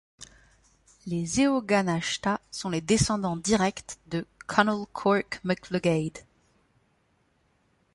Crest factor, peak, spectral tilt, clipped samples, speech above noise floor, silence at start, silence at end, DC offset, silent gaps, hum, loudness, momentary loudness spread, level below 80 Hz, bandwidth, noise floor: 22 dB; -6 dBFS; -4.5 dB/octave; under 0.1%; 42 dB; 0.2 s; 1.75 s; under 0.1%; none; none; -27 LUFS; 13 LU; -54 dBFS; 11.5 kHz; -69 dBFS